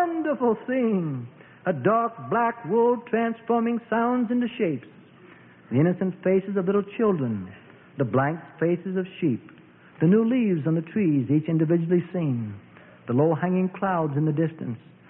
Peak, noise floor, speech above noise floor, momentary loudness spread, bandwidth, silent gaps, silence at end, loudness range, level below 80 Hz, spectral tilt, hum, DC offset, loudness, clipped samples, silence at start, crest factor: -8 dBFS; -50 dBFS; 26 dB; 9 LU; 3.6 kHz; none; 0.35 s; 3 LU; -68 dBFS; -12.5 dB/octave; none; under 0.1%; -24 LUFS; under 0.1%; 0 s; 16 dB